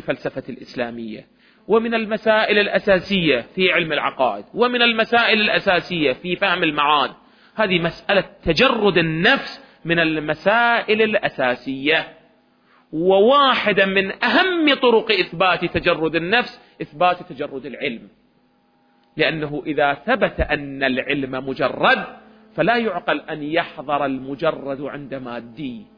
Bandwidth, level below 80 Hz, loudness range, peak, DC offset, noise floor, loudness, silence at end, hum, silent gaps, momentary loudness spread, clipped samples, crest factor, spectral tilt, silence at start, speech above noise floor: 5.4 kHz; -46 dBFS; 6 LU; -2 dBFS; under 0.1%; -60 dBFS; -18 LUFS; 0.15 s; none; none; 14 LU; under 0.1%; 16 dB; -6 dB/octave; 0.05 s; 41 dB